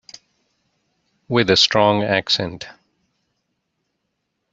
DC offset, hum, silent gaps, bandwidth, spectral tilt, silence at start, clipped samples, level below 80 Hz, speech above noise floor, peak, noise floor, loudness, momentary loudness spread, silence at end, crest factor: under 0.1%; none; none; 8 kHz; -4 dB/octave; 1.3 s; under 0.1%; -58 dBFS; 57 dB; -2 dBFS; -75 dBFS; -17 LUFS; 18 LU; 1.8 s; 20 dB